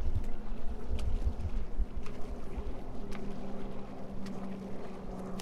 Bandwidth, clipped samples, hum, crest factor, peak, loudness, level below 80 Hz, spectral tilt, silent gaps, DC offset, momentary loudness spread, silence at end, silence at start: 6.6 kHz; under 0.1%; none; 12 dB; -18 dBFS; -42 LUFS; -38 dBFS; -7.5 dB/octave; none; under 0.1%; 7 LU; 0 s; 0 s